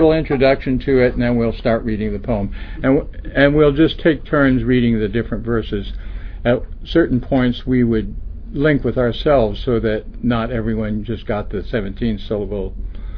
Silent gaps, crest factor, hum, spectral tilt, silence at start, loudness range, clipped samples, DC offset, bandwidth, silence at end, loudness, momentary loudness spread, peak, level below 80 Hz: none; 18 dB; none; -10 dB/octave; 0 s; 4 LU; under 0.1%; under 0.1%; 5.4 kHz; 0 s; -18 LUFS; 10 LU; 0 dBFS; -28 dBFS